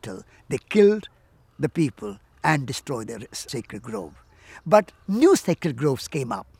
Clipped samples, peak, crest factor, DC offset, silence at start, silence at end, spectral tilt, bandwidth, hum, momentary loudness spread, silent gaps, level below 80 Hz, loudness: under 0.1%; -2 dBFS; 22 dB; under 0.1%; 0.05 s; 0.15 s; -5.5 dB/octave; 16 kHz; none; 18 LU; none; -58 dBFS; -23 LUFS